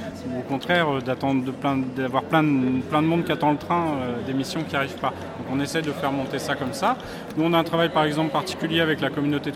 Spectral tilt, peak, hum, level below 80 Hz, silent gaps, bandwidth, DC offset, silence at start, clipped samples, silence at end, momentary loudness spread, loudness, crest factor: -6 dB/octave; -6 dBFS; none; -56 dBFS; none; 15.5 kHz; under 0.1%; 0 s; under 0.1%; 0 s; 7 LU; -24 LUFS; 18 dB